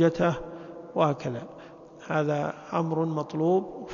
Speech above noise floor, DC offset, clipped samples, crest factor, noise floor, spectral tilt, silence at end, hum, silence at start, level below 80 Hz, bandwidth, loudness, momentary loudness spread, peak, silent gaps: 20 dB; under 0.1%; under 0.1%; 18 dB; -47 dBFS; -7.5 dB/octave; 0 s; none; 0 s; -58 dBFS; 7.2 kHz; -28 LUFS; 18 LU; -10 dBFS; none